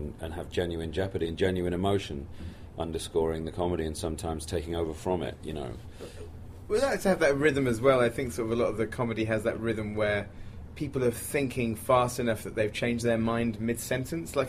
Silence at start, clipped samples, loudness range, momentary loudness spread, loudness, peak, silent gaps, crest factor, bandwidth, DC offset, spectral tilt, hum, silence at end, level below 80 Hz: 0 s; under 0.1%; 5 LU; 14 LU; -29 LUFS; -10 dBFS; none; 20 dB; 15.5 kHz; under 0.1%; -5.5 dB/octave; none; 0 s; -46 dBFS